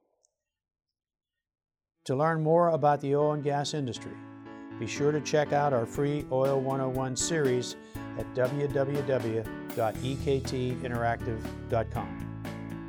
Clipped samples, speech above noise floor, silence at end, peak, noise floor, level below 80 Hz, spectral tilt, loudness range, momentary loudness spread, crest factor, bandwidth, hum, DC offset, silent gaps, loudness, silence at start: under 0.1%; 48 dB; 0 s; -12 dBFS; -76 dBFS; -52 dBFS; -5.5 dB/octave; 3 LU; 13 LU; 18 dB; 17.5 kHz; none; under 0.1%; none; -29 LUFS; 2.05 s